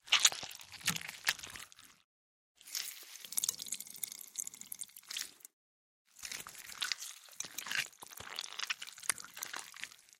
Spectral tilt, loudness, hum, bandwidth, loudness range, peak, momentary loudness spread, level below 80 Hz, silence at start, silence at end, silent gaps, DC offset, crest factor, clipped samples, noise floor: 1.5 dB/octave; -38 LUFS; none; 16.5 kHz; 4 LU; -6 dBFS; 13 LU; -78 dBFS; 0.05 s; 0.05 s; 2.04-2.55 s, 5.53-6.05 s; under 0.1%; 34 dB; under 0.1%; under -90 dBFS